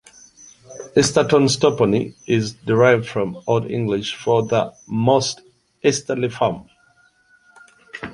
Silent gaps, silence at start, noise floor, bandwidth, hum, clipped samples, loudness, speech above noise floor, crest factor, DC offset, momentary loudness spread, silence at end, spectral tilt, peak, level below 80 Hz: none; 0.7 s; -57 dBFS; 11.5 kHz; none; under 0.1%; -19 LUFS; 39 dB; 18 dB; under 0.1%; 10 LU; 0 s; -5 dB/octave; -2 dBFS; -54 dBFS